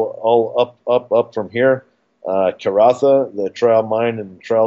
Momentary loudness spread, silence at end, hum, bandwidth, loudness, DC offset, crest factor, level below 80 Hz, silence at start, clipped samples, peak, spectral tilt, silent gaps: 8 LU; 0 s; none; 7.8 kHz; -17 LUFS; under 0.1%; 16 dB; -70 dBFS; 0 s; under 0.1%; 0 dBFS; -6.5 dB/octave; none